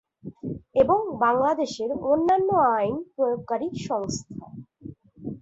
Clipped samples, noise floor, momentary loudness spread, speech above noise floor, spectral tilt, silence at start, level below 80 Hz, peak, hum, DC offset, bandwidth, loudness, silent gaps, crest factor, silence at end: under 0.1%; -44 dBFS; 21 LU; 20 dB; -6 dB/octave; 0.25 s; -56 dBFS; -8 dBFS; none; under 0.1%; 8 kHz; -24 LUFS; none; 18 dB; 0.05 s